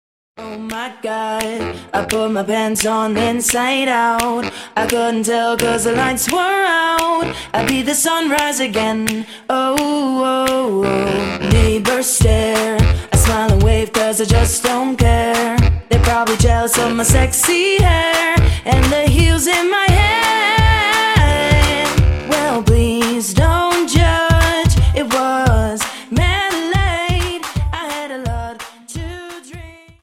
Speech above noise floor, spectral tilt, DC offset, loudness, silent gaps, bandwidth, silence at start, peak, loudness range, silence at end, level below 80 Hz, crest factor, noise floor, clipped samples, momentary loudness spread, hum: 21 dB; -4.5 dB/octave; under 0.1%; -15 LUFS; none; 16.5 kHz; 0.4 s; 0 dBFS; 5 LU; 0.3 s; -22 dBFS; 14 dB; -35 dBFS; under 0.1%; 10 LU; none